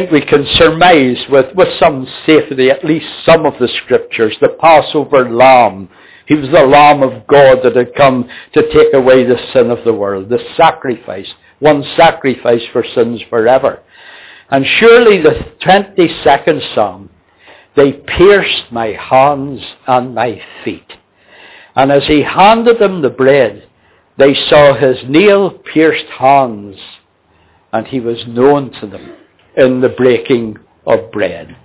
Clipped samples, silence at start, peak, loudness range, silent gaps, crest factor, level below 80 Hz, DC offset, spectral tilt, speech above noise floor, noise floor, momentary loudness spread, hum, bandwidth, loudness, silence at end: 0.7%; 0 s; 0 dBFS; 6 LU; none; 10 dB; -40 dBFS; under 0.1%; -9.5 dB/octave; 42 dB; -51 dBFS; 12 LU; none; 4 kHz; -9 LUFS; 0.15 s